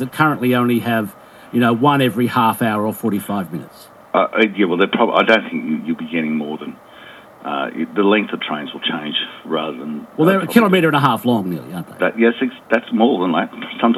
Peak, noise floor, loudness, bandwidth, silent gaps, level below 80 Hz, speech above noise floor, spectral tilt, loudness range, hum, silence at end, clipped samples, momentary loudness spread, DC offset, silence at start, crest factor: 0 dBFS; -40 dBFS; -17 LUFS; 14.5 kHz; none; -66 dBFS; 23 dB; -6 dB/octave; 5 LU; none; 0 s; under 0.1%; 12 LU; under 0.1%; 0 s; 18 dB